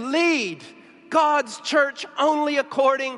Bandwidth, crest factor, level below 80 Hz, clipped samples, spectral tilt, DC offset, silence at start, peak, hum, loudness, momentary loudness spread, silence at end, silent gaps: 11.5 kHz; 16 dB; -82 dBFS; under 0.1%; -2.5 dB/octave; under 0.1%; 0 s; -6 dBFS; none; -21 LUFS; 5 LU; 0 s; none